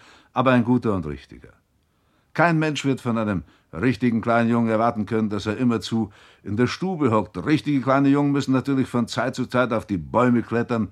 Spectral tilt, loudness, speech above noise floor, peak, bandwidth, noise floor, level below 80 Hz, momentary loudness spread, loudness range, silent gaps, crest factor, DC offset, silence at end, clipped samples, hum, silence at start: -7 dB/octave; -22 LUFS; 44 dB; -4 dBFS; 11.5 kHz; -65 dBFS; -52 dBFS; 8 LU; 2 LU; none; 18 dB; under 0.1%; 0 s; under 0.1%; none; 0.35 s